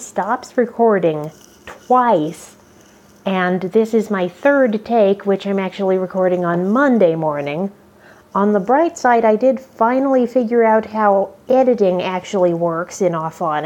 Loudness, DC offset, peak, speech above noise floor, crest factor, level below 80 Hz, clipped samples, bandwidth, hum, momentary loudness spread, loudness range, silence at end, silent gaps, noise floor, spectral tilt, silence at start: -16 LUFS; under 0.1%; -2 dBFS; 31 dB; 16 dB; -62 dBFS; under 0.1%; 14.5 kHz; none; 7 LU; 4 LU; 0 s; none; -47 dBFS; -6.5 dB/octave; 0 s